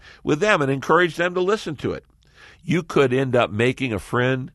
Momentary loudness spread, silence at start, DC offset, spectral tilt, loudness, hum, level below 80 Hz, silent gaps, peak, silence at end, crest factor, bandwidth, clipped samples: 9 LU; 0.05 s; under 0.1%; -6 dB/octave; -21 LUFS; none; -52 dBFS; none; -2 dBFS; 0.05 s; 18 dB; 12.5 kHz; under 0.1%